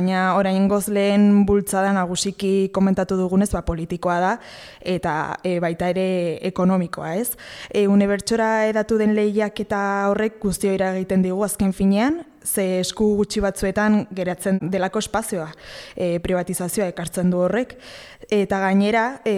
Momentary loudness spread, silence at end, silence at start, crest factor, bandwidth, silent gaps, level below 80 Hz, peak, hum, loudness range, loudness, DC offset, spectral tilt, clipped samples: 8 LU; 0 s; 0 s; 14 dB; 15.5 kHz; none; -44 dBFS; -6 dBFS; none; 4 LU; -21 LUFS; under 0.1%; -5.5 dB/octave; under 0.1%